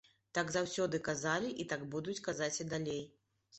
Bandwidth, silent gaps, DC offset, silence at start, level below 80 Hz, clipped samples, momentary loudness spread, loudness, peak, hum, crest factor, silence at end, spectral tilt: 8.4 kHz; none; under 0.1%; 0.35 s; -70 dBFS; under 0.1%; 6 LU; -38 LUFS; -20 dBFS; none; 20 dB; 0 s; -4 dB/octave